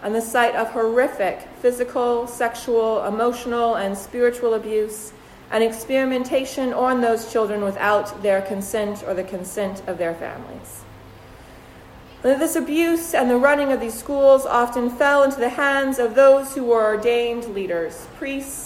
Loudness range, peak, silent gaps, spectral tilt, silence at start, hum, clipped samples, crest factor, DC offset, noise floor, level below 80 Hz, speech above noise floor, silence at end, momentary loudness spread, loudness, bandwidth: 9 LU; -4 dBFS; none; -4 dB/octave; 0 s; none; under 0.1%; 16 dB; under 0.1%; -43 dBFS; -52 dBFS; 23 dB; 0 s; 11 LU; -20 LUFS; 16 kHz